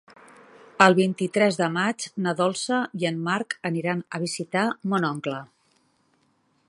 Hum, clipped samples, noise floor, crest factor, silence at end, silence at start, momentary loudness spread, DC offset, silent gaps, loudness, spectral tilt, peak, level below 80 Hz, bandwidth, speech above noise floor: none; under 0.1%; -67 dBFS; 24 dB; 1.25 s; 0.8 s; 11 LU; under 0.1%; none; -24 LUFS; -5 dB/octave; 0 dBFS; -72 dBFS; 11.5 kHz; 43 dB